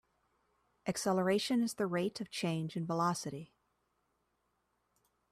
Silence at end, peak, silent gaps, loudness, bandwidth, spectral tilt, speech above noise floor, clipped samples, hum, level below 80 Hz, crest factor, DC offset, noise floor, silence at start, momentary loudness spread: 1.85 s; -20 dBFS; none; -35 LUFS; 14.5 kHz; -5 dB/octave; 46 dB; under 0.1%; none; -76 dBFS; 18 dB; under 0.1%; -80 dBFS; 0.85 s; 9 LU